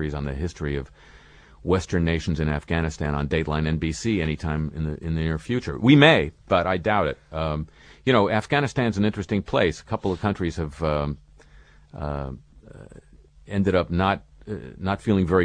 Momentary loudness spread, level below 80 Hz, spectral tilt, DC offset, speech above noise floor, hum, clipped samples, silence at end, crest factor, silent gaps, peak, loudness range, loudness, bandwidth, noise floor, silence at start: 11 LU; -38 dBFS; -6.5 dB/octave; under 0.1%; 28 dB; none; under 0.1%; 0 s; 22 dB; none; -2 dBFS; 8 LU; -24 LUFS; 10 kHz; -51 dBFS; 0 s